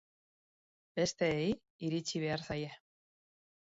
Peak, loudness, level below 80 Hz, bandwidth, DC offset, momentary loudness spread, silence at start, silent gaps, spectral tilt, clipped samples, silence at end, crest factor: -20 dBFS; -36 LUFS; -66 dBFS; 7.6 kHz; under 0.1%; 8 LU; 0.95 s; 1.70-1.79 s; -4.5 dB/octave; under 0.1%; 1 s; 20 dB